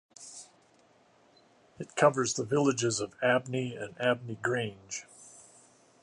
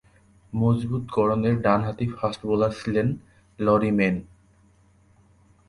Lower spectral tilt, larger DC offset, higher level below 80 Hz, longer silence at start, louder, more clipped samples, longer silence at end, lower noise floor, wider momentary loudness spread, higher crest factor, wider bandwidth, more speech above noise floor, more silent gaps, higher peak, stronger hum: second, -4 dB/octave vs -8.5 dB/octave; neither; second, -72 dBFS vs -50 dBFS; second, 0.2 s vs 0.55 s; second, -30 LUFS vs -24 LUFS; neither; second, 0.6 s vs 1.45 s; first, -64 dBFS vs -58 dBFS; first, 20 LU vs 7 LU; first, 24 dB vs 18 dB; about the same, 11.5 kHz vs 11.5 kHz; about the same, 34 dB vs 35 dB; neither; about the same, -8 dBFS vs -6 dBFS; neither